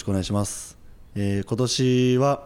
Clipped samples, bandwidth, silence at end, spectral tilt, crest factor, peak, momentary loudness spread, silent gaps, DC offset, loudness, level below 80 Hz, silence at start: under 0.1%; 15.5 kHz; 0 s; -5.5 dB/octave; 12 dB; -10 dBFS; 15 LU; none; under 0.1%; -23 LUFS; -48 dBFS; 0 s